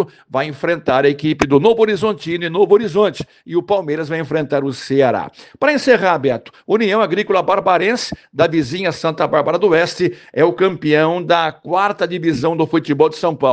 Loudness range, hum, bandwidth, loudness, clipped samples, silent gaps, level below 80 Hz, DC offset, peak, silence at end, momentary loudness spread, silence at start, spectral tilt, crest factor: 2 LU; none; 9 kHz; -16 LUFS; under 0.1%; none; -54 dBFS; under 0.1%; 0 dBFS; 0 s; 8 LU; 0 s; -6 dB/octave; 16 dB